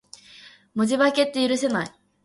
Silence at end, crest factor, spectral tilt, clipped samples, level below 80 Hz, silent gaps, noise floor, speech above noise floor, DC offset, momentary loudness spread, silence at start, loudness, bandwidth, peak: 0.35 s; 16 dB; -4 dB/octave; under 0.1%; -68 dBFS; none; -49 dBFS; 28 dB; under 0.1%; 14 LU; 0.45 s; -23 LUFS; 11.5 kHz; -8 dBFS